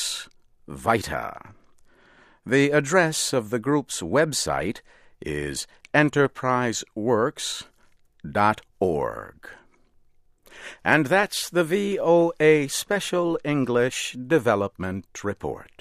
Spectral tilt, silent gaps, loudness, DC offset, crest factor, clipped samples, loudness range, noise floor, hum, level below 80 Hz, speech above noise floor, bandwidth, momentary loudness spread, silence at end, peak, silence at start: -4.5 dB/octave; none; -23 LUFS; under 0.1%; 22 dB; under 0.1%; 5 LU; -58 dBFS; none; -54 dBFS; 35 dB; 15.5 kHz; 14 LU; 0.15 s; -2 dBFS; 0 s